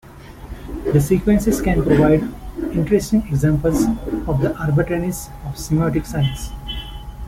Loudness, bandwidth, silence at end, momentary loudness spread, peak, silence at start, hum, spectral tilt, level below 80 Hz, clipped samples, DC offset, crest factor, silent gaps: -19 LUFS; 16.5 kHz; 0 s; 14 LU; -2 dBFS; 0.05 s; none; -7 dB/octave; -32 dBFS; under 0.1%; under 0.1%; 16 dB; none